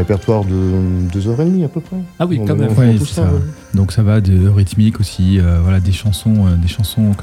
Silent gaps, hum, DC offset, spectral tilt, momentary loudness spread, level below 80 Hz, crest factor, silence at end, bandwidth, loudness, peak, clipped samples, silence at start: none; none; under 0.1%; -7.5 dB/octave; 6 LU; -30 dBFS; 12 dB; 0 s; 13.5 kHz; -14 LUFS; 0 dBFS; under 0.1%; 0 s